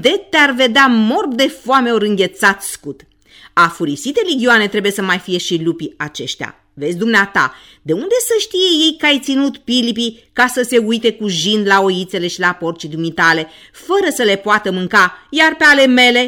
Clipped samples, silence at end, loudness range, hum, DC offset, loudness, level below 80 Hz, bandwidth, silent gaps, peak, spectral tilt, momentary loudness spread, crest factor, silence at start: under 0.1%; 0 s; 3 LU; none; under 0.1%; -14 LUFS; -54 dBFS; 19 kHz; none; 0 dBFS; -3.5 dB/octave; 12 LU; 14 dB; 0 s